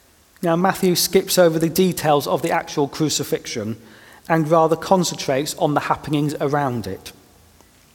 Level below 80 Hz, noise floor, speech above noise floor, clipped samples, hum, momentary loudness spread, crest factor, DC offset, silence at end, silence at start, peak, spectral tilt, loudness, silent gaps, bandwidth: -54 dBFS; -52 dBFS; 32 dB; under 0.1%; none; 11 LU; 20 dB; under 0.1%; 0.85 s; 0.4 s; 0 dBFS; -4.5 dB/octave; -19 LUFS; none; 19 kHz